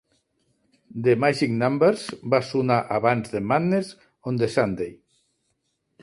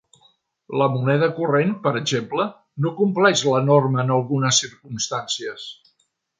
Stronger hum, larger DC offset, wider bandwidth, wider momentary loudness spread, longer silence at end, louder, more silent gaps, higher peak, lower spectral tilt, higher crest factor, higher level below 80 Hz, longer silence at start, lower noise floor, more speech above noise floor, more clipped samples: neither; neither; first, 11.5 kHz vs 9.6 kHz; about the same, 11 LU vs 11 LU; first, 1.1 s vs 0.65 s; second, -23 LUFS vs -20 LUFS; neither; about the same, -4 dBFS vs -2 dBFS; first, -6.5 dB/octave vs -4.5 dB/octave; about the same, 20 dB vs 18 dB; first, -60 dBFS vs -66 dBFS; first, 0.95 s vs 0.7 s; first, -74 dBFS vs -68 dBFS; about the same, 51 dB vs 48 dB; neither